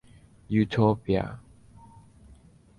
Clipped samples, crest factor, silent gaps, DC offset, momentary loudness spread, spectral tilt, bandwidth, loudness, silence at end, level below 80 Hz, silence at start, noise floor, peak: under 0.1%; 20 dB; none; under 0.1%; 14 LU; -8.5 dB/octave; 10.5 kHz; -26 LUFS; 1.4 s; -50 dBFS; 0.5 s; -54 dBFS; -10 dBFS